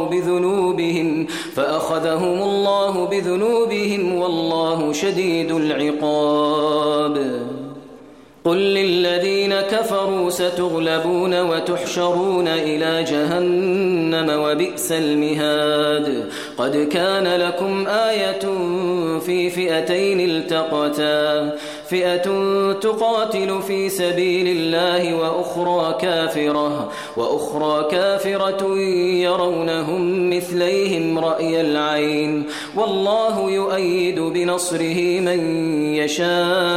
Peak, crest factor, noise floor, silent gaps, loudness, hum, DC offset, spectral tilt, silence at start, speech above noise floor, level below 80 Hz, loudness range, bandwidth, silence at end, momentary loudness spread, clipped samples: -6 dBFS; 12 dB; -43 dBFS; none; -19 LUFS; none; 0.1%; -4.5 dB/octave; 0 s; 24 dB; -62 dBFS; 1 LU; 16 kHz; 0 s; 4 LU; under 0.1%